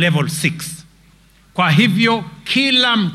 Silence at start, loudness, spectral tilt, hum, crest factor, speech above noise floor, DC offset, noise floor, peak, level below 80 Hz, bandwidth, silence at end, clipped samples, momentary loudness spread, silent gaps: 0 s; -15 LUFS; -4.5 dB/octave; none; 14 dB; 34 dB; under 0.1%; -50 dBFS; -2 dBFS; -54 dBFS; 14.5 kHz; 0 s; under 0.1%; 15 LU; none